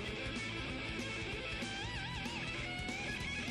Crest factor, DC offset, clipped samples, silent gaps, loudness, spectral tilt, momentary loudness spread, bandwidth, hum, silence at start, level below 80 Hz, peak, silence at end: 12 dB; under 0.1%; under 0.1%; none; -40 LUFS; -4 dB/octave; 1 LU; 12.5 kHz; none; 0 s; -52 dBFS; -28 dBFS; 0 s